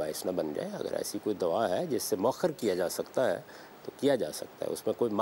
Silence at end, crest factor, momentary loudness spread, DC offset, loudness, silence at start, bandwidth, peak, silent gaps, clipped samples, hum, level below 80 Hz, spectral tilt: 0 s; 16 dB; 8 LU; under 0.1%; -32 LUFS; 0 s; 16 kHz; -14 dBFS; none; under 0.1%; none; -70 dBFS; -4.5 dB/octave